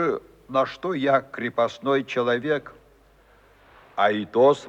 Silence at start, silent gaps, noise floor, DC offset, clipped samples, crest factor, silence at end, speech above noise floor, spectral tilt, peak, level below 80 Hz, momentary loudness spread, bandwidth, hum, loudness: 0 s; none; -56 dBFS; under 0.1%; under 0.1%; 18 dB; 0 s; 33 dB; -6 dB/octave; -6 dBFS; -62 dBFS; 7 LU; 8.6 kHz; none; -24 LUFS